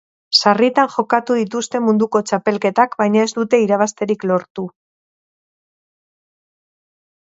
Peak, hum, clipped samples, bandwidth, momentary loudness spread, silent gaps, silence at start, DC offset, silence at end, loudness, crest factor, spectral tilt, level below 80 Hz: 0 dBFS; none; under 0.1%; 8 kHz; 7 LU; 4.50-4.55 s; 0.3 s; under 0.1%; 2.55 s; -16 LUFS; 18 dB; -4.5 dB/octave; -68 dBFS